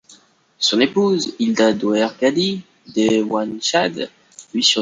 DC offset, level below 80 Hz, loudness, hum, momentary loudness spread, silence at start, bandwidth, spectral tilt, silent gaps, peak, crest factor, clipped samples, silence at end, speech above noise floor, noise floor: under 0.1%; -62 dBFS; -18 LUFS; none; 10 LU; 0.6 s; 9.6 kHz; -3.5 dB/octave; none; -2 dBFS; 16 dB; under 0.1%; 0 s; 33 dB; -51 dBFS